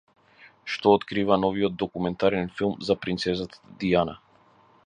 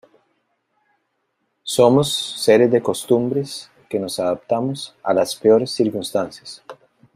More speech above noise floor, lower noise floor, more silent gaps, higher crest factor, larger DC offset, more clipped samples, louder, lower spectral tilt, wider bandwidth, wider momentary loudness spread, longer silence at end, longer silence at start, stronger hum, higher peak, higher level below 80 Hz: second, 33 dB vs 53 dB; second, -58 dBFS vs -71 dBFS; neither; about the same, 22 dB vs 18 dB; neither; neither; second, -25 LUFS vs -19 LUFS; first, -6.5 dB/octave vs -5 dB/octave; second, 9.8 kHz vs 16 kHz; second, 10 LU vs 16 LU; first, 0.7 s vs 0.4 s; second, 0.4 s vs 1.65 s; neither; about the same, -4 dBFS vs -2 dBFS; first, -54 dBFS vs -62 dBFS